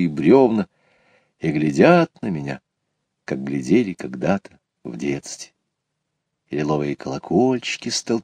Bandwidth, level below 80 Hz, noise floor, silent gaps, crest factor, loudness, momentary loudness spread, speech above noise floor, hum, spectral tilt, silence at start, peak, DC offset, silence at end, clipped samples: 10 kHz; -56 dBFS; -77 dBFS; none; 20 dB; -20 LUFS; 19 LU; 58 dB; none; -6 dB/octave; 0 s; 0 dBFS; under 0.1%; 0 s; under 0.1%